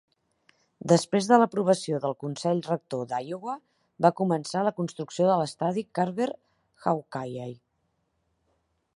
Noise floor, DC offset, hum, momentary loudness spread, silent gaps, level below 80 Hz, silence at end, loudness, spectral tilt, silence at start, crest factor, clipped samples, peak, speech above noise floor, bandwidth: -75 dBFS; under 0.1%; none; 14 LU; none; -74 dBFS; 1.4 s; -27 LUFS; -6 dB/octave; 0.85 s; 24 dB; under 0.1%; -4 dBFS; 49 dB; 11.5 kHz